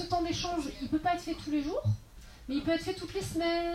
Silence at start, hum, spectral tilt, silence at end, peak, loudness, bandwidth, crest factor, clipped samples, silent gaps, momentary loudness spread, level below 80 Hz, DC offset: 0 s; none; -5.5 dB/octave; 0 s; -18 dBFS; -33 LUFS; 15.5 kHz; 16 dB; under 0.1%; none; 5 LU; -50 dBFS; under 0.1%